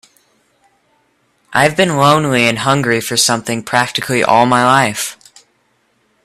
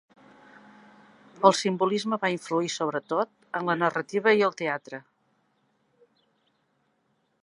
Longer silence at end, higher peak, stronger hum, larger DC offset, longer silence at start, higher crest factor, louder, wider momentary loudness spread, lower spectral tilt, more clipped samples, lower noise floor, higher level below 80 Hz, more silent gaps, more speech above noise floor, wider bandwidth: second, 1.1 s vs 2.45 s; first, 0 dBFS vs -4 dBFS; neither; neither; about the same, 1.5 s vs 1.4 s; second, 16 dB vs 26 dB; first, -13 LUFS vs -26 LUFS; second, 7 LU vs 10 LU; about the same, -3.5 dB/octave vs -4.5 dB/octave; neither; second, -60 dBFS vs -72 dBFS; first, -54 dBFS vs -80 dBFS; neither; about the same, 47 dB vs 46 dB; first, 16 kHz vs 11.5 kHz